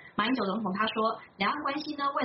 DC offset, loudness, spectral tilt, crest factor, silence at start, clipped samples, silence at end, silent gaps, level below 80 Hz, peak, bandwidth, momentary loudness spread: under 0.1%; -30 LUFS; -2.5 dB/octave; 16 dB; 0 s; under 0.1%; 0 s; none; -70 dBFS; -14 dBFS; 5.8 kHz; 3 LU